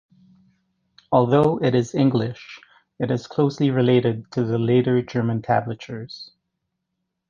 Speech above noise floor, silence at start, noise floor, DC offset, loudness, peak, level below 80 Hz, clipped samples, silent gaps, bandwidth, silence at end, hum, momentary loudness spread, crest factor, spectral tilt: 58 dB; 1.1 s; -78 dBFS; under 0.1%; -21 LUFS; -4 dBFS; -58 dBFS; under 0.1%; none; 7.4 kHz; 1.05 s; none; 16 LU; 18 dB; -8 dB/octave